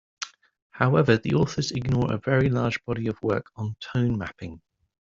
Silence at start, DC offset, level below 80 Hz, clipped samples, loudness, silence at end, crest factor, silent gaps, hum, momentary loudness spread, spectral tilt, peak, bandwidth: 0.2 s; under 0.1%; -52 dBFS; under 0.1%; -25 LUFS; 0.55 s; 22 dB; 0.62-0.70 s; none; 15 LU; -6.5 dB/octave; -4 dBFS; 7.6 kHz